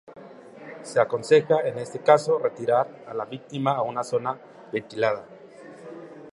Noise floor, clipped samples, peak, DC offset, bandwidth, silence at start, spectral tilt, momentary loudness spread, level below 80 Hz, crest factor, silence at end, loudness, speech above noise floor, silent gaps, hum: -45 dBFS; under 0.1%; -2 dBFS; under 0.1%; 11.5 kHz; 0.1 s; -5.5 dB/octave; 23 LU; -74 dBFS; 22 dB; 0.05 s; -24 LUFS; 21 dB; none; none